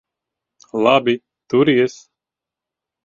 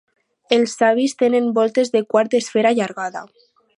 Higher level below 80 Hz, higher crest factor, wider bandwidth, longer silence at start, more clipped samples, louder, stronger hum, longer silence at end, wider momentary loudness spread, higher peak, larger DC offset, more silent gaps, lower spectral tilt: first, -62 dBFS vs -72 dBFS; about the same, 20 dB vs 18 dB; second, 7.6 kHz vs 11.5 kHz; first, 0.75 s vs 0.5 s; neither; about the same, -17 LUFS vs -18 LUFS; neither; first, 1.15 s vs 0.55 s; about the same, 9 LU vs 8 LU; about the same, 0 dBFS vs 0 dBFS; neither; neither; first, -6 dB/octave vs -4 dB/octave